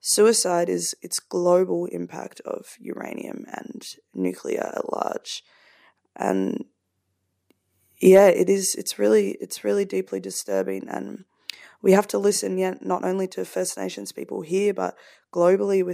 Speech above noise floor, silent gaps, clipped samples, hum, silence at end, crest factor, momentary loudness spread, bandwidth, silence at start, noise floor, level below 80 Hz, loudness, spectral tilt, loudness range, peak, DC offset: 52 dB; none; under 0.1%; none; 0 s; 20 dB; 18 LU; 15.5 kHz; 0.05 s; -75 dBFS; -74 dBFS; -23 LUFS; -4 dB/octave; 10 LU; -4 dBFS; under 0.1%